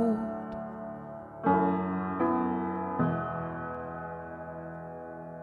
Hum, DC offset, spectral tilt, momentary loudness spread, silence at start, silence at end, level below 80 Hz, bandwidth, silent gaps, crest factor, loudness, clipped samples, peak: none; under 0.1%; -10.5 dB/octave; 14 LU; 0 s; 0 s; -60 dBFS; 4.4 kHz; none; 18 dB; -32 LUFS; under 0.1%; -14 dBFS